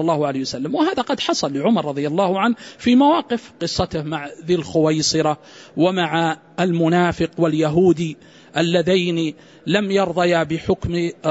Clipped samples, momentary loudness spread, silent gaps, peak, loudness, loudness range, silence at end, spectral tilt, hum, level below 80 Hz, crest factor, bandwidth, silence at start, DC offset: under 0.1%; 8 LU; none; -4 dBFS; -19 LUFS; 1 LU; 0 s; -5.5 dB/octave; none; -48 dBFS; 14 dB; 8 kHz; 0 s; under 0.1%